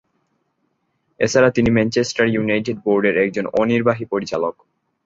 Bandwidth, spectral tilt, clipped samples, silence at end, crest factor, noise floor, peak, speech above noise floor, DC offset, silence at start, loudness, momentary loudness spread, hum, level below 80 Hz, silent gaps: 7.8 kHz; -5.5 dB/octave; under 0.1%; 0.55 s; 18 dB; -69 dBFS; -2 dBFS; 51 dB; under 0.1%; 1.2 s; -18 LUFS; 8 LU; none; -48 dBFS; none